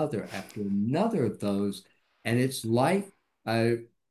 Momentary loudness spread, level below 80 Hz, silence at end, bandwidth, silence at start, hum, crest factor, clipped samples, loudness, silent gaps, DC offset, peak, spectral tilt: 12 LU; -64 dBFS; 0.25 s; 13.5 kHz; 0 s; none; 18 dB; under 0.1%; -29 LUFS; none; under 0.1%; -12 dBFS; -6.5 dB/octave